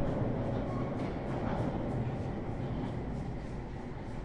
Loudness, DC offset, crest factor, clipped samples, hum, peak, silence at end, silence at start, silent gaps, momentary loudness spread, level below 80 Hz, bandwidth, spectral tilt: -37 LUFS; 0.2%; 16 dB; under 0.1%; none; -20 dBFS; 0 s; 0 s; none; 8 LU; -44 dBFS; 10 kHz; -9 dB/octave